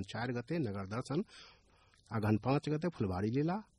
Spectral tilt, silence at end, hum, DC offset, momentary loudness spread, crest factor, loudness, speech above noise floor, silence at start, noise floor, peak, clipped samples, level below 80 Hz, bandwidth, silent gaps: -7.5 dB/octave; 0.15 s; none; under 0.1%; 8 LU; 18 dB; -36 LUFS; 31 dB; 0 s; -67 dBFS; -18 dBFS; under 0.1%; -64 dBFS; 12 kHz; none